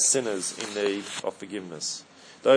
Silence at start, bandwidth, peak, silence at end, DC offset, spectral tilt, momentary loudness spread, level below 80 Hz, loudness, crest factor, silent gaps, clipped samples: 0 s; 10.5 kHz; -6 dBFS; 0 s; under 0.1%; -2 dB/octave; 12 LU; -78 dBFS; -29 LUFS; 20 dB; none; under 0.1%